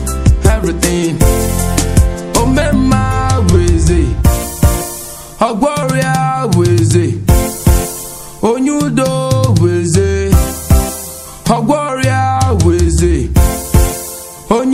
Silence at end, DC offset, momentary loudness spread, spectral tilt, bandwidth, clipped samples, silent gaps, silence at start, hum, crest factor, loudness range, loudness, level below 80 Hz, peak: 0 s; under 0.1%; 6 LU; -5.5 dB/octave; 16.5 kHz; 0.2%; none; 0 s; none; 12 dB; 1 LU; -13 LUFS; -18 dBFS; 0 dBFS